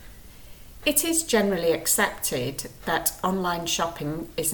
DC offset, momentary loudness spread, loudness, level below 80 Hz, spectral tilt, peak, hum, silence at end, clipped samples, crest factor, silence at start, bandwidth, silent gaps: under 0.1%; 8 LU; -24 LUFS; -48 dBFS; -2.5 dB/octave; -6 dBFS; none; 0 s; under 0.1%; 20 dB; 0 s; 19.5 kHz; none